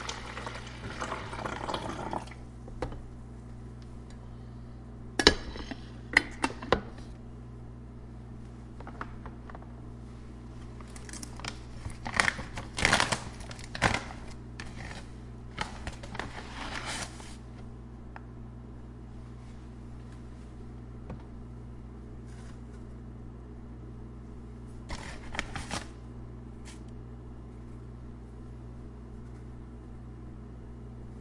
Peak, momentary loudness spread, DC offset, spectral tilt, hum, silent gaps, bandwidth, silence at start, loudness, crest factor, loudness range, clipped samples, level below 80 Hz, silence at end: 0 dBFS; 18 LU; under 0.1%; -3.5 dB/octave; 60 Hz at -45 dBFS; none; 11.5 kHz; 0 s; -36 LUFS; 36 dB; 16 LU; under 0.1%; -46 dBFS; 0 s